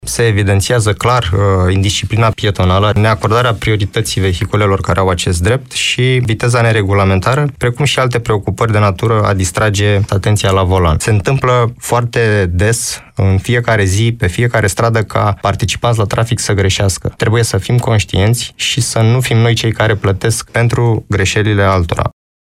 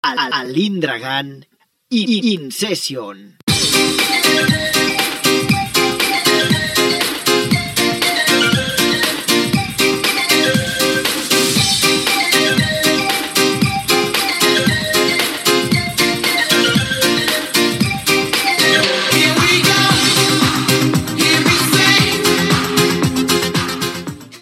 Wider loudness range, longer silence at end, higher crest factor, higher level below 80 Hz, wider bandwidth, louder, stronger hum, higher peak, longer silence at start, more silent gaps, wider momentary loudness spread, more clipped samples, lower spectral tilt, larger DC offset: about the same, 1 LU vs 3 LU; first, 0.3 s vs 0.05 s; about the same, 12 dB vs 16 dB; first, -32 dBFS vs -46 dBFS; about the same, 15 kHz vs 16.5 kHz; about the same, -13 LUFS vs -14 LUFS; neither; about the same, 0 dBFS vs 0 dBFS; about the same, 0.05 s vs 0.05 s; second, none vs 3.43-3.47 s; second, 3 LU vs 7 LU; neither; first, -5 dB/octave vs -3 dB/octave; neither